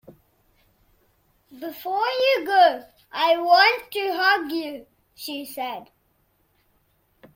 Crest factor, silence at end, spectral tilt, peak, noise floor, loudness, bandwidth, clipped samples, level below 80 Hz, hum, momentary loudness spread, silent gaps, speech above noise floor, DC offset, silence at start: 20 dB; 1.5 s; -2 dB/octave; -4 dBFS; -66 dBFS; -21 LUFS; 16.5 kHz; under 0.1%; -68 dBFS; none; 20 LU; none; 45 dB; under 0.1%; 0.1 s